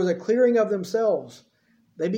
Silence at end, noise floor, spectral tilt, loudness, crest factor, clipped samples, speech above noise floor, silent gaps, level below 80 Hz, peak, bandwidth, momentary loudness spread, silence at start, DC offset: 0 s; -62 dBFS; -6.5 dB/octave; -23 LUFS; 14 dB; under 0.1%; 40 dB; none; -76 dBFS; -10 dBFS; 16 kHz; 9 LU; 0 s; under 0.1%